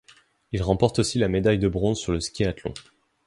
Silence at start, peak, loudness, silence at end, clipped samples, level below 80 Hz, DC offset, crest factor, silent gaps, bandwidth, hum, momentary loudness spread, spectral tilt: 0.5 s; -4 dBFS; -24 LUFS; 0.45 s; under 0.1%; -40 dBFS; under 0.1%; 20 dB; none; 11.5 kHz; none; 12 LU; -5.5 dB/octave